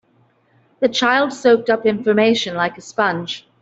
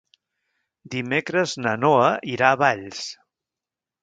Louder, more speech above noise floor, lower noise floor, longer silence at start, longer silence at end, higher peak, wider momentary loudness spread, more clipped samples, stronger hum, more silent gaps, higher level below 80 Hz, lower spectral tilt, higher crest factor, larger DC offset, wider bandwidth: first, -17 LUFS vs -21 LUFS; second, 41 dB vs 67 dB; second, -58 dBFS vs -89 dBFS; about the same, 0.8 s vs 0.85 s; second, 0.2 s vs 0.9 s; about the same, -2 dBFS vs 0 dBFS; second, 7 LU vs 14 LU; neither; neither; neither; about the same, -62 dBFS vs -66 dBFS; about the same, -4.5 dB/octave vs -4.5 dB/octave; second, 16 dB vs 22 dB; neither; second, 8 kHz vs 9.2 kHz